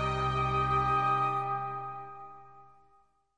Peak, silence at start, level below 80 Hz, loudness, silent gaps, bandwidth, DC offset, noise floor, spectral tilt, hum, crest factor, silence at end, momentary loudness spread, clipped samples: -18 dBFS; 0 s; -48 dBFS; -30 LUFS; none; 10 kHz; 0.2%; -67 dBFS; -6.5 dB/octave; 50 Hz at -70 dBFS; 14 dB; 0.75 s; 18 LU; under 0.1%